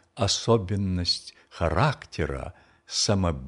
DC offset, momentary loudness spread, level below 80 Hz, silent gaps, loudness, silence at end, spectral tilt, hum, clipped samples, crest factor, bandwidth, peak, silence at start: under 0.1%; 9 LU; -42 dBFS; none; -26 LUFS; 0 s; -4.5 dB/octave; none; under 0.1%; 20 dB; 11 kHz; -8 dBFS; 0.15 s